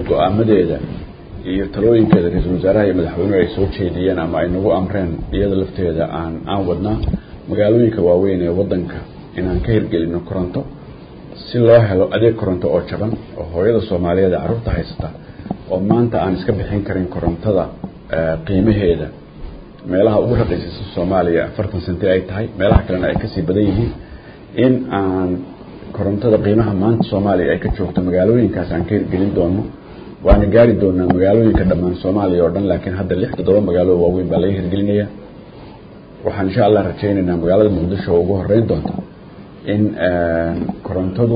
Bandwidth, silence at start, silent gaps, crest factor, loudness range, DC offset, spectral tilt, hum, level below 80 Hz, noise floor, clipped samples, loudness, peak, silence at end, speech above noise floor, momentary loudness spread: 5.2 kHz; 0 s; none; 16 dB; 4 LU; under 0.1%; -12.5 dB/octave; none; -30 dBFS; -37 dBFS; under 0.1%; -16 LUFS; 0 dBFS; 0 s; 22 dB; 13 LU